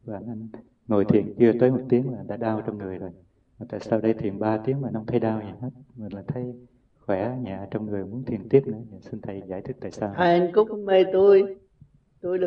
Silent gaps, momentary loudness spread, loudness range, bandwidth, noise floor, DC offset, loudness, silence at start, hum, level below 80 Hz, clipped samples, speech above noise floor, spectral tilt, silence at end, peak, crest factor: none; 18 LU; 7 LU; 6.6 kHz; -56 dBFS; under 0.1%; -24 LUFS; 0.05 s; none; -60 dBFS; under 0.1%; 32 dB; -9 dB/octave; 0 s; -4 dBFS; 20 dB